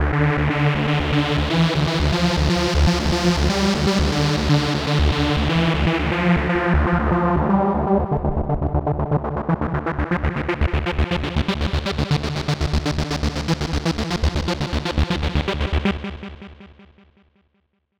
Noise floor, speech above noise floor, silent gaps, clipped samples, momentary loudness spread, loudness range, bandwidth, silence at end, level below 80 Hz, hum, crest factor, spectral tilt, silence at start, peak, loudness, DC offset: -68 dBFS; 49 dB; none; under 0.1%; 5 LU; 4 LU; 12.5 kHz; 1.35 s; -26 dBFS; none; 18 dB; -6 dB/octave; 0 s; -2 dBFS; -20 LUFS; under 0.1%